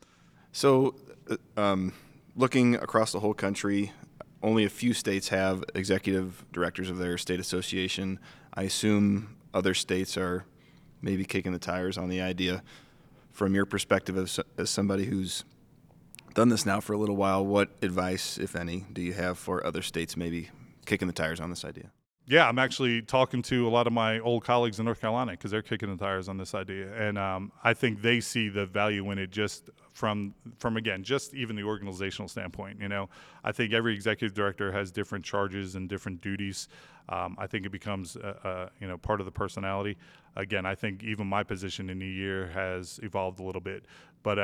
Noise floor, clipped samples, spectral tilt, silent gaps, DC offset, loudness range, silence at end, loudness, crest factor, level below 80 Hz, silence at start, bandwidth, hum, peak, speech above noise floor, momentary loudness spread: -59 dBFS; under 0.1%; -5 dB/octave; none; under 0.1%; 7 LU; 0 s; -30 LUFS; 26 dB; -60 dBFS; 0.55 s; 16.5 kHz; none; -4 dBFS; 30 dB; 12 LU